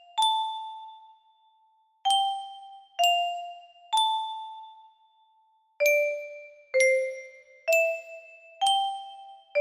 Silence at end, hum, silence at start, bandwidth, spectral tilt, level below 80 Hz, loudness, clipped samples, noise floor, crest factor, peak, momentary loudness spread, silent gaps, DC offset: 0 s; none; 0.15 s; 15.5 kHz; 3 dB/octave; -82 dBFS; -26 LUFS; under 0.1%; -66 dBFS; 18 dB; -10 dBFS; 22 LU; none; under 0.1%